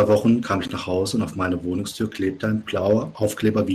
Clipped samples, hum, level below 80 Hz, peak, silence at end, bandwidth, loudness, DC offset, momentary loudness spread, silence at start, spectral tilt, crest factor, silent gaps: under 0.1%; none; -54 dBFS; -8 dBFS; 0 s; 14 kHz; -23 LUFS; under 0.1%; 6 LU; 0 s; -6 dB/octave; 14 dB; none